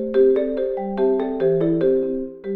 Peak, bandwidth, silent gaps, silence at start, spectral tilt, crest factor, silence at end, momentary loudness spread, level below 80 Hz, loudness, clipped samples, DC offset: -6 dBFS; 4.3 kHz; none; 0 s; -11 dB/octave; 12 dB; 0 s; 7 LU; -48 dBFS; -20 LUFS; under 0.1%; under 0.1%